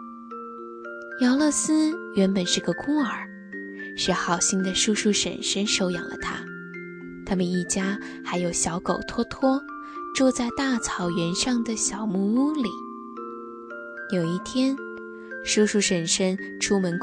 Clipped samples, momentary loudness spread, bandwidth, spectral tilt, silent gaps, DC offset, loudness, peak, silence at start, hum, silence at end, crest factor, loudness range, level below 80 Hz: under 0.1%; 16 LU; 11 kHz; -3.5 dB/octave; none; under 0.1%; -24 LUFS; -8 dBFS; 0 s; none; 0 s; 18 dB; 3 LU; -54 dBFS